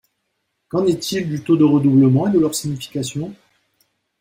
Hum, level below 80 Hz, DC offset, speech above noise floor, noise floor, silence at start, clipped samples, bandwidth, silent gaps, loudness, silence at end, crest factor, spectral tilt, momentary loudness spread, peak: none; -58 dBFS; under 0.1%; 56 dB; -73 dBFS; 0.75 s; under 0.1%; 16.5 kHz; none; -17 LUFS; 0.85 s; 14 dB; -6.5 dB/octave; 12 LU; -4 dBFS